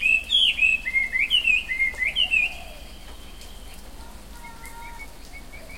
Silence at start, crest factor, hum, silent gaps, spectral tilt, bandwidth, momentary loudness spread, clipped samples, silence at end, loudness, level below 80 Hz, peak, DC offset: 0 s; 16 dB; none; none; -0.5 dB/octave; 16.5 kHz; 25 LU; under 0.1%; 0 s; -20 LUFS; -44 dBFS; -8 dBFS; 0.7%